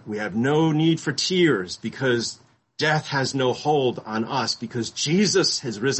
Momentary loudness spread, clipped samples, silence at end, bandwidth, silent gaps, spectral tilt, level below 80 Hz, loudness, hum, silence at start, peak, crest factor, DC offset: 8 LU; under 0.1%; 0 s; 8.6 kHz; none; -4.5 dB/octave; -62 dBFS; -22 LUFS; none; 0.05 s; -8 dBFS; 16 dB; under 0.1%